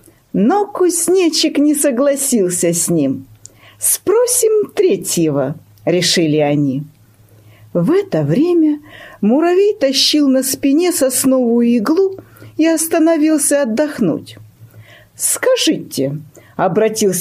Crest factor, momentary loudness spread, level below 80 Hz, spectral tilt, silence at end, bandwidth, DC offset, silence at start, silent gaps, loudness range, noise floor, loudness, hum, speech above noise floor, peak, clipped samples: 14 dB; 8 LU; -58 dBFS; -4 dB/octave; 0 s; 15.5 kHz; under 0.1%; 0.35 s; none; 3 LU; -46 dBFS; -14 LUFS; none; 33 dB; -2 dBFS; under 0.1%